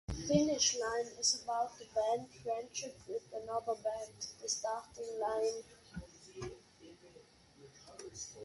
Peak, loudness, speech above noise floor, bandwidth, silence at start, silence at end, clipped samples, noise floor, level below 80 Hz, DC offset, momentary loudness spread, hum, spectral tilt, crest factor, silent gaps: -16 dBFS; -37 LUFS; 23 dB; 11.5 kHz; 0.1 s; 0 s; under 0.1%; -62 dBFS; -60 dBFS; under 0.1%; 19 LU; none; -3 dB/octave; 22 dB; none